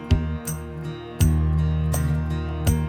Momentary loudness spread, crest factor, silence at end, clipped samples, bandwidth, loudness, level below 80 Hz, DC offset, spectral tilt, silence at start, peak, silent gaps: 11 LU; 16 dB; 0 s; under 0.1%; 17 kHz; -24 LUFS; -28 dBFS; under 0.1%; -6.5 dB/octave; 0 s; -6 dBFS; none